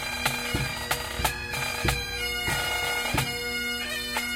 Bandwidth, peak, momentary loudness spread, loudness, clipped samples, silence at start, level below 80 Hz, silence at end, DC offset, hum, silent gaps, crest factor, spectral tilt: 16 kHz; -10 dBFS; 3 LU; -27 LUFS; under 0.1%; 0 s; -40 dBFS; 0 s; under 0.1%; none; none; 20 dB; -2.5 dB/octave